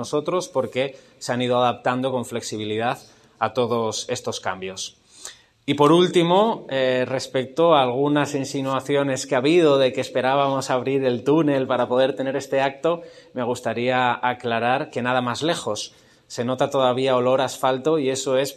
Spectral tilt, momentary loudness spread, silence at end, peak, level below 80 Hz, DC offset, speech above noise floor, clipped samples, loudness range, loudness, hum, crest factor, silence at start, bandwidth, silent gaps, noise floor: -5 dB/octave; 12 LU; 0 s; -2 dBFS; -66 dBFS; under 0.1%; 22 dB; under 0.1%; 5 LU; -22 LUFS; none; 20 dB; 0 s; 13.5 kHz; none; -43 dBFS